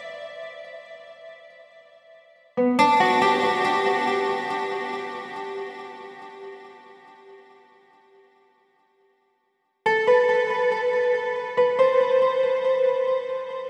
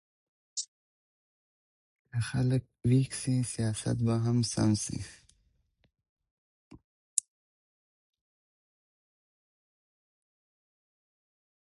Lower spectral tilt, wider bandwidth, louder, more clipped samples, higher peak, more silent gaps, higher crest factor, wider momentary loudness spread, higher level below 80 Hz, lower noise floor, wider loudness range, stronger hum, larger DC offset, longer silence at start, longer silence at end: about the same, -4.5 dB/octave vs -5.5 dB/octave; about the same, 10.5 kHz vs 11.5 kHz; first, -22 LUFS vs -31 LUFS; neither; about the same, -4 dBFS vs -4 dBFS; second, none vs 0.68-2.05 s, 6.09-6.16 s, 6.31-6.71 s, 6.84-7.17 s; second, 20 dB vs 30 dB; first, 22 LU vs 11 LU; second, -84 dBFS vs -58 dBFS; about the same, -72 dBFS vs -72 dBFS; first, 15 LU vs 12 LU; neither; neither; second, 0 s vs 0.55 s; second, 0 s vs 4.4 s